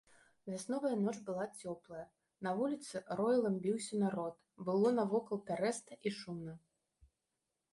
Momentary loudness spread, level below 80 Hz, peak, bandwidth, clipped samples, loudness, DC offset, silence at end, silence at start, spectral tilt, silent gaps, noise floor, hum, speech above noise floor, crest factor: 14 LU; -78 dBFS; -22 dBFS; 11.5 kHz; under 0.1%; -38 LUFS; under 0.1%; 1.15 s; 0.45 s; -6 dB/octave; none; -88 dBFS; none; 51 dB; 16 dB